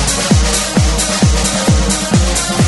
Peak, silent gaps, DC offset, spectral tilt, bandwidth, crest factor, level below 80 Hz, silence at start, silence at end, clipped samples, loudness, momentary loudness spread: 0 dBFS; none; under 0.1%; -4 dB/octave; 12 kHz; 12 dB; -18 dBFS; 0 s; 0 s; under 0.1%; -12 LUFS; 1 LU